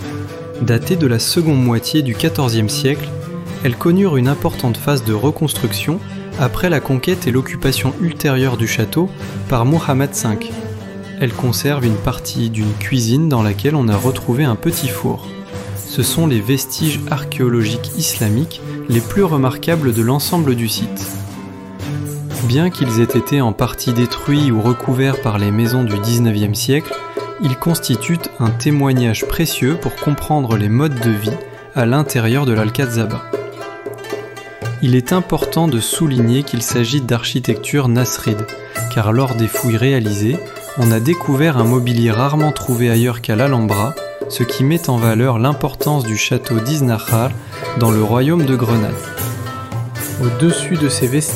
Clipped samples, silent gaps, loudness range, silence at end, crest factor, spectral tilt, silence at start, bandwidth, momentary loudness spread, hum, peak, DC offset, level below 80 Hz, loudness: under 0.1%; none; 3 LU; 0 s; 14 dB; -5.5 dB/octave; 0 s; 16.5 kHz; 10 LU; none; -2 dBFS; under 0.1%; -40 dBFS; -16 LUFS